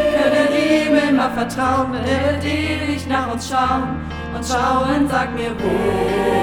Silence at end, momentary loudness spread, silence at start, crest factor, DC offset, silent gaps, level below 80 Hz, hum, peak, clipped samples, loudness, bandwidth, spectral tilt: 0 s; 7 LU; 0 s; 16 dB; under 0.1%; none; -36 dBFS; none; -2 dBFS; under 0.1%; -18 LUFS; 17.5 kHz; -5.5 dB/octave